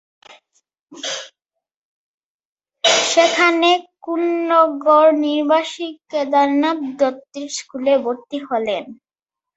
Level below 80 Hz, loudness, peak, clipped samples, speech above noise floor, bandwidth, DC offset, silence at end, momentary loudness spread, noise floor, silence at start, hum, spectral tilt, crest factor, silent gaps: -70 dBFS; -17 LUFS; -2 dBFS; under 0.1%; 71 dB; 8.2 kHz; under 0.1%; 0.65 s; 14 LU; -88 dBFS; 0.3 s; none; -1.5 dB/octave; 18 dB; 0.81-0.87 s, 1.76-2.56 s